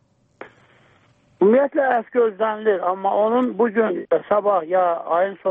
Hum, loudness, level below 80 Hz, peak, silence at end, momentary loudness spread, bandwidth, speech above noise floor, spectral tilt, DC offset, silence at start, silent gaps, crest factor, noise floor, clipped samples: none; -19 LUFS; -68 dBFS; -6 dBFS; 0 s; 4 LU; 3.9 kHz; 38 dB; -9 dB/octave; under 0.1%; 0.4 s; none; 14 dB; -57 dBFS; under 0.1%